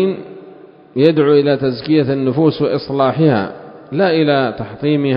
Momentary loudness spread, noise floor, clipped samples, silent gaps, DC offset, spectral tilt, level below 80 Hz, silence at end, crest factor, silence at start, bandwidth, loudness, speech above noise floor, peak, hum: 13 LU; -40 dBFS; under 0.1%; none; under 0.1%; -10.5 dB/octave; -52 dBFS; 0 s; 14 dB; 0 s; 5.4 kHz; -15 LUFS; 26 dB; 0 dBFS; none